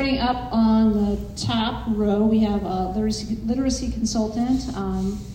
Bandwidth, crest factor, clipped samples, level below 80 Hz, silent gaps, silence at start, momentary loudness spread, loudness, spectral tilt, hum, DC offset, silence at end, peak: 10 kHz; 12 dB; under 0.1%; -36 dBFS; none; 0 s; 7 LU; -22 LUFS; -5.5 dB/octave; none; under 0.1%; 0 s; -10 dBFS